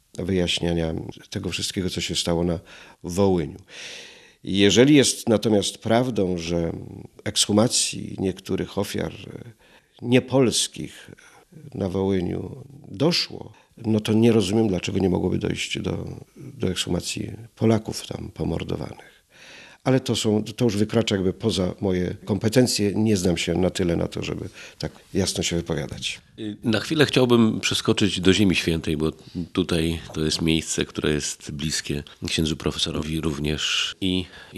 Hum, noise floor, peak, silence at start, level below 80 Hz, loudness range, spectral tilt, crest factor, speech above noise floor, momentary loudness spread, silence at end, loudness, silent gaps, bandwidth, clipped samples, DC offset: none; -47 dBFS; -2 dBFS; 0.15 s; -50 dBFS; 6 LU; -4.5 dB/octave; 22 dB; 24 dB; 15 LU; 0 s; -23 LUFS; none; 13.5 kHz; under 0.1%; under 0.1%